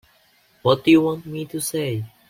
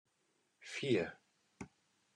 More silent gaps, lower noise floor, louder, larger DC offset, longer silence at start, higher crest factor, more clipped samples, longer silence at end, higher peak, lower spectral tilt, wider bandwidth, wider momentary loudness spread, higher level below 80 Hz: neither; second, -59 dBFS vs -80 dBFS; first, -21 LUFS vs -39 LUFS; neither; about the same, 0.65 s vs 0.6 s; about the same, 18 dB vs 22 dB; neither; second, 0.2 s vs 0.5 s; first, -4 dBFS vs -20 dBFS; about the same, -5.5 dB/octave vs -5.5 dB/octave; first, 16.5 kHz vs 11 kHz; second, 13 LU vs 19 LU; first, -60 dBFS vs -76 dBFS